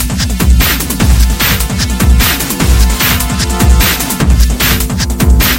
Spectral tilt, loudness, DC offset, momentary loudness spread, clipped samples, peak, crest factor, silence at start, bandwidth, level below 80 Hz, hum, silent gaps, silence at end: -4 dB/octave; -10 LUFS; under 0.1%; 4 LU; 0.2%; 0 dBFS; 10 dB; 0 s; 17.5 kHz; -12 dBFS; none; none; 0 s